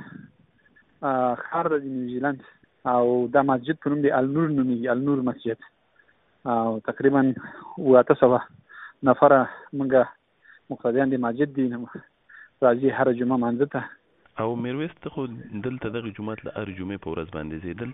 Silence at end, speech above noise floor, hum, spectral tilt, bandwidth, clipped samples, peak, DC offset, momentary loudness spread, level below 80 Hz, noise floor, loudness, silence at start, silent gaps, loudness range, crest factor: 0 s; 39 dB; none; -6.5 dB/octave; 4 kHz; under 0.1%; -2 dBFS; under 0.1%; 15 LU; -60 dBFS; -62 dBFS; -24 LUFS; 0 s; none; 9 LU; 22 dB